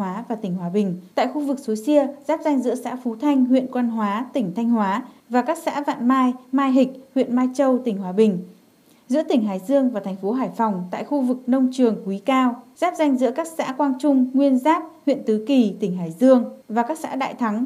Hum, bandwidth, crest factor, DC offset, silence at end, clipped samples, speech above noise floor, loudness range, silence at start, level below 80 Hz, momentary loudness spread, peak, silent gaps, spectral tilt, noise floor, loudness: none; 14 kHz; 16 dB; under 0.1%; 0 s; under 0.1%; 34 dB; 2 LU; 0 s; -80 dBFS; 7 LU; -4 dBFS; none; -6.5 dB/octave; -54 dBFS; -21 LUFS